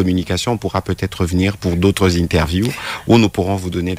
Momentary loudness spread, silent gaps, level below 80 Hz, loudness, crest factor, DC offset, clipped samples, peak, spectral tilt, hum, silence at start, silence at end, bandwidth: 7 LU; none; -34 dBFS; -17 LUFS; 16 dB; under 0.1%; under 0.1%; -2 dBFS; -6 dB/octave; none; 0 s; 0 s; 16 kHz